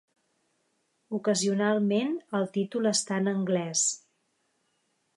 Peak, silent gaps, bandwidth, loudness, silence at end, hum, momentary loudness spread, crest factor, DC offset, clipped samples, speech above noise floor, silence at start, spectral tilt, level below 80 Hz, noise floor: -12 dBFS; none; 11.5 kHz; -27 LUFS; 1.2 s; none; 5 LU; 16 dB; under 0.1%; under 0.1%; 47 dB; 1.1 s; -4 dB/octave; -80 dBFS; -74 dBFS